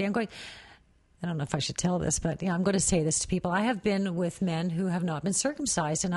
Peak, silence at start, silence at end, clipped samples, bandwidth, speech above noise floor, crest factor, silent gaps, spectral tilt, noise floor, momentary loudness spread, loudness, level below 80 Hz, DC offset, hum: -12 dBFS; 0 s; 0 s; under 0.1%; 11.5 kHz; 31 dB; 16 dB; none; -4.5 dB/octave; -60 dBFS; 9 LU; -28 LUFS; -50 dBFS; under 0.1%; none